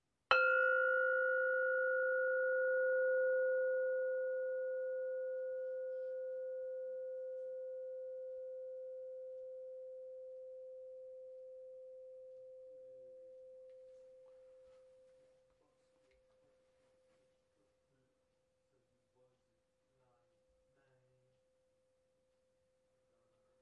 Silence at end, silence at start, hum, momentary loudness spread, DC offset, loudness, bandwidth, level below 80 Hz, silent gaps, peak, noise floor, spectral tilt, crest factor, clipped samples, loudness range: 8.9 s; 0.3 s; none; 23 LU; under 0.1%; -37 LUFS; 5.8 kHz; -90 dBFS; none; -14 dBFS; -82 dBFS; 3 dB/octave; 28 dB; under 0.1%; 23 LU